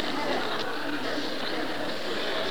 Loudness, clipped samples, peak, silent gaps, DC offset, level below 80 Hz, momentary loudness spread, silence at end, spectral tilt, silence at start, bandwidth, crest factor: -30 LUFS; under 0.1%; -14 dBFS; none; 2%; -70 dBFS; 3 LU; 0 s; -3.5 dB/octave; 0 s; over 20 kHz; 18 dB